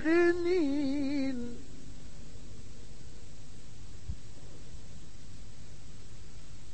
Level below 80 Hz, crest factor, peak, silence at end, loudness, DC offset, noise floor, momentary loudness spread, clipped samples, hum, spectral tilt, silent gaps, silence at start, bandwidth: -52 dBFS; 18 dB; -16 dBFS; 0 s; -31 LUFS; 2%; -50 dBFS; 22 LU; under 0.1%; none; -6 dB/octave; none; 0 s; 8.8 kHz